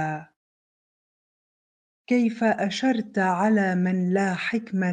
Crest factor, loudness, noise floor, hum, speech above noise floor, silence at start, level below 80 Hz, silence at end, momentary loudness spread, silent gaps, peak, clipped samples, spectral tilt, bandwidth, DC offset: 16 dB; -24 LUFS; under -90 dBFS; none; over 67 dB; 0 s; -72 dBFS; 0 s; 5 LU; 0.36-2.05 s; -10 dBFS; under 0.1%; -6.5 dB/octave; 9.4 kHz; under 0.1%